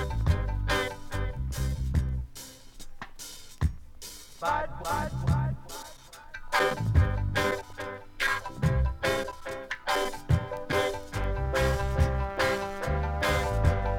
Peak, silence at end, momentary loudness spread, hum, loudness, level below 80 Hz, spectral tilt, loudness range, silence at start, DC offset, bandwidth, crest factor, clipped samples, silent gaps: -10 dBFS; 0 s; 16 LU; none; -29 LUFS; -34 dBFS; -5.5 dB/octave; 6 LU; 0 s; under 0.1%; 17 kHz; 18 dB; under 0.1%; none